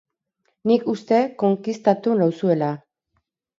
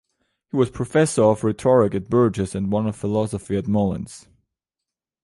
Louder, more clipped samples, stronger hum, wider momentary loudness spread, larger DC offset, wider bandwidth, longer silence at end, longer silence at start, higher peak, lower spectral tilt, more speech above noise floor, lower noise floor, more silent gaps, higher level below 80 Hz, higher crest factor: about the same, -21 LUFS vs -21 LUFS; neither; neither; about the same, 6 LU vs 8 LU; neither; second, 7.6 kHz vs 11.5 kHz; second, 0.8 s vs 1.05 s; about the same, 0.65 s vs 0.55 s; about the same, -2 dBFS vs -4 dBFS; about the same, -8 dB/octave vs -7 dB/octave; second, 53 dB vs 66 dB; second, -72 dBFS vs -87 dBFS; neither; second, -70 dBFS vs -48 dBFS; about the same, 18 dB vs 16 dB